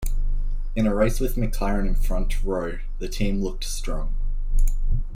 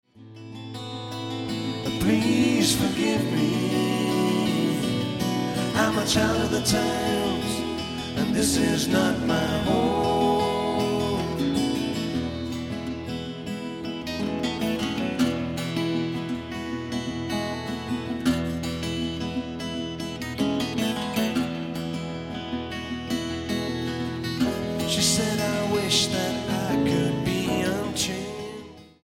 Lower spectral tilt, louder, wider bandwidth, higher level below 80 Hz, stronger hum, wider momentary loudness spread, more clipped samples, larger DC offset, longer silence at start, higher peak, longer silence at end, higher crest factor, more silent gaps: first, -6 dB/octave vs -4.5 dB/octave; about the same, -27 LUFS vs -26 LUFS; about the same, 15.5 kHz vs 17 kHz; first, -22 dBFS vs -48 dBFS; neither; about the same, 9 LU vs 10 LU; neither; neither; second, 0 s vs 0.15 s; about the same, -8 dBFS vs -8 dBFS; second, 0 s vs 0.15 s; second, 12 dB vs 18 dB; neither